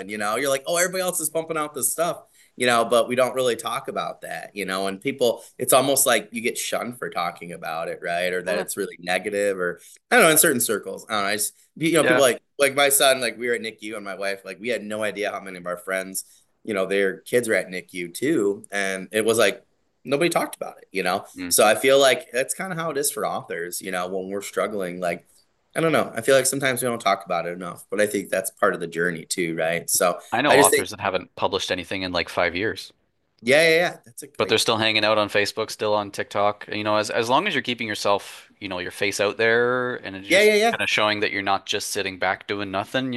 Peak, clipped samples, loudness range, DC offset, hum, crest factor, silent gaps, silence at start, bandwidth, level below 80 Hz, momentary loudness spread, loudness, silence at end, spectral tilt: 0 dBFS; under 0.1%; 5 LU; under 0.1%; none; 22 dB; none; 0 s; 13 kHz; -66 dBFS; 13 LU; -22 LUFS; 0 s; -2.5 dB/octave